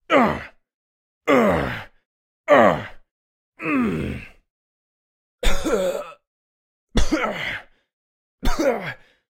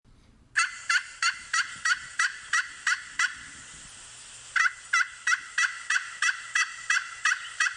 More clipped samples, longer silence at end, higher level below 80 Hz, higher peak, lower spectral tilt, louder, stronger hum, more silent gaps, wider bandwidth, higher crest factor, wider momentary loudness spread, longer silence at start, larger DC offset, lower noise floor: neither; first, 0.35 s vs 0 s; first, -32 dBFS vs -66 dBFS; first, -2 dBFS vs -12 dBFS; first, -5 dB/octave vs 3 dB/octave; first, -22 LUFS vs -27 LUFS; neither; first, 0.74-1.21 s, 2.05-2.44 s, 3.11-3.52 s, 4.50-5.38 s, 6.27-6.87 s, 7.93-8.38 s vs none; first, 16 kHz vs 11.5 kHz; about the same, 20 dB vs 18 dB; about the same, 16 LU vs 17 LU; second, 0.1 s vs 0.55 s; neither; first, under -90 dBFS vs -57 dBFS